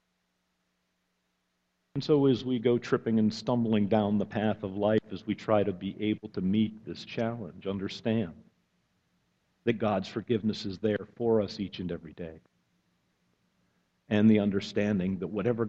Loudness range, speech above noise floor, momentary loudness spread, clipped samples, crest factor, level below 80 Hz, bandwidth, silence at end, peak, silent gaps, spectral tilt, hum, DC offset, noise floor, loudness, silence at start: 6 LU; 49 dB; 11 LU; under 0.1%; 18 dB; -62 dBFS; 7.6 kHz; 0 s; -12 dBFS; none; -7.5 dB/octave; none; under 0.1%; -78 dBFS; -29 LUFS; 1.95 s